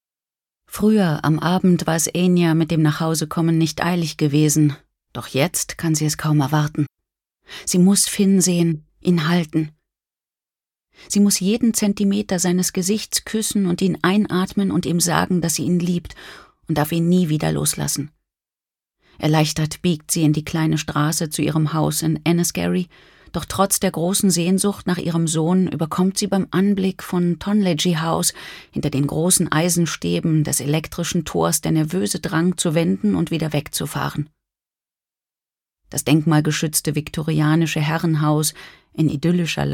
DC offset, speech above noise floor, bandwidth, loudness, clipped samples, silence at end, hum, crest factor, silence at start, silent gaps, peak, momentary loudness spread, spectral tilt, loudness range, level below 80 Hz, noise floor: under 0.1%; over 71 dB; 18 kHz; -19 LUFS; under 0.1%; 0 s; none; 18 dB; 0.7 s; none; -2 dBFS; 8 LU; -5 dB/octave; 3 LU; -50 dBFS; under -90 dBFS